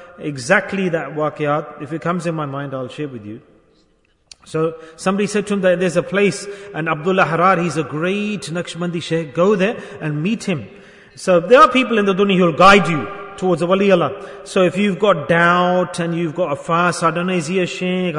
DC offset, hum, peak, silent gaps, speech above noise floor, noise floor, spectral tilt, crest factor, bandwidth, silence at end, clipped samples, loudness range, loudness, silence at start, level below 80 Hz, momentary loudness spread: under 0.1%; none; 0 dBFS; none; 42 dB; -59 dBFS; -5.5 dB/octave; 18 dB; 11 kHz; 0 s; under 0.1%; 10 LU; -17 LUFS; 0 s; -50 dBFS; 14 LU